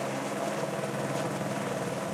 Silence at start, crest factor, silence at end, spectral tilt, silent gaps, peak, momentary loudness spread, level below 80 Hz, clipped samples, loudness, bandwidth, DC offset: 0 s; 14 dB; 0 s; -5 dB/octave; none; -18 dBFS; 1 LU; -70 dBFS; under 0.1%; -32 LUFS; 16.5 kHz; under 0.1%